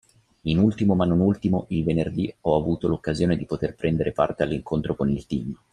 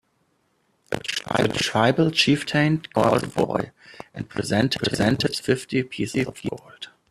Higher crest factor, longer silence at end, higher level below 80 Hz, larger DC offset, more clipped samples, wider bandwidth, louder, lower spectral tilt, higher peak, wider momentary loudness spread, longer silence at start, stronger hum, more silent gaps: about the same, 18 dB vs 20 dB; about the same, 0.2 s vs 0.25 s; first, -46 dBFS vs -54 dBFS; neither; neither; second, 10 kHz vs 13.5 kHz; about the same, -24 LUFS vs -23 LUFS; first, -8.5 dB/octave vs -5 dB/octave; about the same, -6 dBFS vs -4 dBFS; second, 7 LU vs 16 LU; second, 0.45 s vs 0.9 s; neither; neither